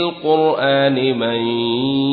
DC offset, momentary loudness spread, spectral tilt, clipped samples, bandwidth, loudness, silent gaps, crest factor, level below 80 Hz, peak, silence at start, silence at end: under 0.1%; 4 LU; -11 dB/octave; under 0.1%; 4.9 kHz; -17 LUFS; none; 14 dB; -58 dBFS; -4 dBFS; 0 s; 0 s